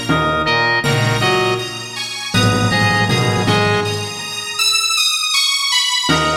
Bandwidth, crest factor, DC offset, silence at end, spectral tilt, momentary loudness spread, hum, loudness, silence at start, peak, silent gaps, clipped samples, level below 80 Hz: 16.5 kHz; 14 dB; under 0.1%; 0 s; -3 dB/octave; 9 LU; none; -15 LUFS; 0 s; -2 dBFS; none; under 0.1%; -42 dBFS